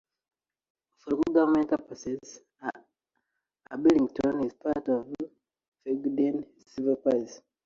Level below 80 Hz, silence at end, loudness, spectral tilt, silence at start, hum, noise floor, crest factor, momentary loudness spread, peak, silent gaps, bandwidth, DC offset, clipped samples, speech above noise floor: -64 dBFS; 0.3 s; -28 LUFS; -6.5 dB/octave; 1.05 s; none; -81 dBFS; 20 dB; 18 LU; -10 dBFS; 5.68-5.72 s; 7.6 kHz; under 0.1%; under 0.1%; 54 dB